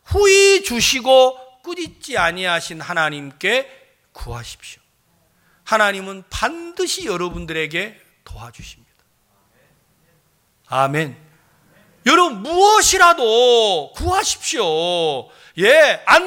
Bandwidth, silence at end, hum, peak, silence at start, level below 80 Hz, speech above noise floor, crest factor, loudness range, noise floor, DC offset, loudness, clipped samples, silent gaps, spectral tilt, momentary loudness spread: 17 kHz; 0 s; none; 0 dBFS; 0.1 s; -42 dBFS; 44 dB; 18 dB; 12 LU; -61 dBFS; under 0.1%; -16 LUFS; under 0.1%; none; -2.5 dB/octave; 20 LU